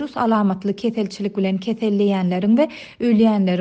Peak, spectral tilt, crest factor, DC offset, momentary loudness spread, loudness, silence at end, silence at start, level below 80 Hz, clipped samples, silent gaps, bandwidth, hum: -6 dBFS; -8 dB/octave; 12 dB; under 0.1%; 7 LU; -19 LUFS; 0 s; 0 s; -60 dBFS; under 0.1%; none; 8 kHz; none